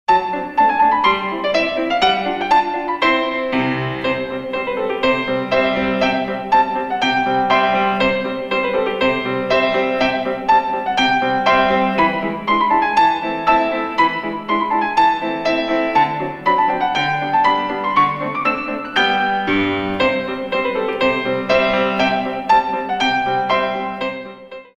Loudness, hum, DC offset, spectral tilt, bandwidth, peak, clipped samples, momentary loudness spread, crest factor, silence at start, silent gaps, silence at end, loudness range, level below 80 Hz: -17 LUFS; none; under 0.1%; -5 dB/octave; 9.8 kHz; 0 dBFS; under 0.1%; 6 LU; 16 dB; 0.1 s; none; 0.15 s; 2 LU; -48 dBFS